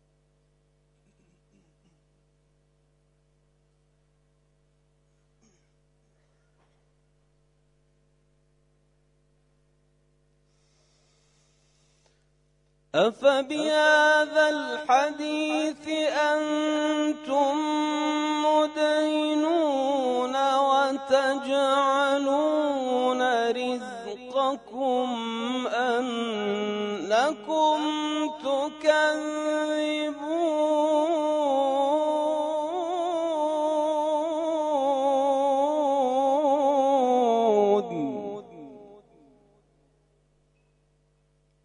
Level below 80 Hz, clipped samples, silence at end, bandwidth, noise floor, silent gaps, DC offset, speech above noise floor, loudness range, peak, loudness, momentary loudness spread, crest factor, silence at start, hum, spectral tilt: -72 dBFS; under 0.1%; 2.7 s; 11 kHz; -67 dBFS; none; under 0.1%; 43 dB; 4 LU; -8 dBFS; -25 LUFS; 7 LU; 18 dB; 12.95 s; 50 Hz at -65 dBFS; -3.5 dB/octave